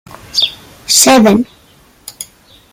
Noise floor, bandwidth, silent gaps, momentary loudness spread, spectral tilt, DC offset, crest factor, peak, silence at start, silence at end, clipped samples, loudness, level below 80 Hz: -46 dBFS; over 20 kHz; none; 23 LU; -2.5 dB/octave; under 0.1%; 14 dB; 0 dBFS; 0.35 s; 0.5 s; under 0.1%; -9 LUFS; -50 dBFS